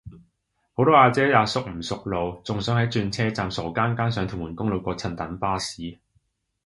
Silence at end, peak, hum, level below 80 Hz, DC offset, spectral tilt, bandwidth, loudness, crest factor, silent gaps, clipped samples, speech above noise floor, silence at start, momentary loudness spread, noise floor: 0.7 s; -2 dBFS; none; -48 dBFS; under 0.1%; -6 dB/octave; 11.5 kHz; -23 LUFS; 22 dB; none; under 0.1%; 49 dB; 0.05 s; 14 LU; -73 dBFS